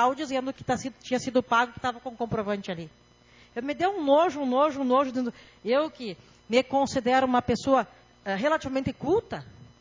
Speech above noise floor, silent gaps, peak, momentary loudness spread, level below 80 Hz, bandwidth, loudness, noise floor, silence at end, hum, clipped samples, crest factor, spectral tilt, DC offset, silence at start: 30 dB; none; -10 dBFS; 15 LU; -56 dBFS; 7.6 kHz; -27 LUFS; -56 dBFS; 0.15 s; none; under 0.1%; 18 dB; -5 dB/octave; under 0.1%; 0 s